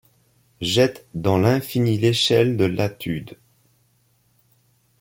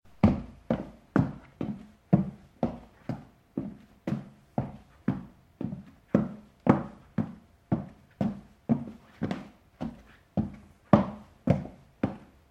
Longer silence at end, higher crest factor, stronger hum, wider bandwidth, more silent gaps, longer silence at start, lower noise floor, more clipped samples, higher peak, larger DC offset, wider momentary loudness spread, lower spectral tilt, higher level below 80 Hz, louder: first, 1.7 s vs 0.25 s; second, 18 dB vs 26 dB; neither; first, 17 kHz vs 7.8 kHz; neither; first, 0.6 s vs 0.25 s; first, -63 dBFS vs -48 dBFS; neither; about the same, -4 dBFS vs -4 dBFS; neither; second, 12 LU vs 16 LU; second, -5.5 dB/octave vs -9.5 dB/octave; about the same, -54 dBFS vs -52 dBFS; first, -20 LUFS vs -32 LUFS